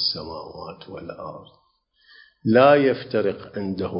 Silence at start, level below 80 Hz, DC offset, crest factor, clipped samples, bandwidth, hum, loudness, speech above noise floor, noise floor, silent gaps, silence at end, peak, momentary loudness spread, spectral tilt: 0 s; -56 dBFS; under 0.1%; 20 dB; under 0.1%; 5.4 kHz; none; -20 LUFS; 40 dB; -62 dBFS; none; 0 s; -2 dBFS; 22 LU; -9.5 dB/octave